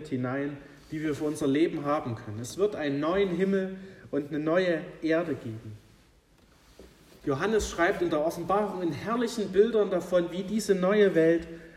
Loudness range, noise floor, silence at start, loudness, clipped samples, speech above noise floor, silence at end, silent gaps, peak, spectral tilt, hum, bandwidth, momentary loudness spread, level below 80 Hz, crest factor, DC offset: 6 LU; -60 dBFS; 0 s; -28 LUFS; under 0.1%; 33 dB; 0 s; none; -10 dBFS; -6 dB/octave; none; 14.5 kHz; 12 LU; -54 dBFS; 18 dB; under 0.1%